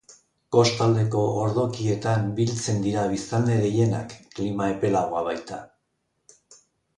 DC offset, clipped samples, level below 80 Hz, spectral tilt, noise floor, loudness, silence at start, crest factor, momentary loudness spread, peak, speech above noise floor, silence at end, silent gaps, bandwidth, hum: under 0.1%; under 0.1%; -56 dBFS; -6 dB/octave; -75 dBFS; -24 LUFS; 0.1 s; 18 dB; 10 LU; -6 dBFS; 52 dB; 0.45 s; none; 10.5 kHz; none